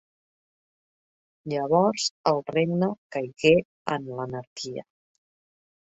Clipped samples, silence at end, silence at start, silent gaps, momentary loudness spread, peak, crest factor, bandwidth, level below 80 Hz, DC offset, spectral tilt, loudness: under 0.1%; 1.05 s; 1.45 s; 2.11-2.24 s, 2.98-3.10 s, 3.65-3.85 s, 4.47-4.56 s; 14 LU; -4 dBFS; 22 dB; 8.2 kHz; -62 dBFS; under 0.1%; -5 dB/octave; -26 LUFS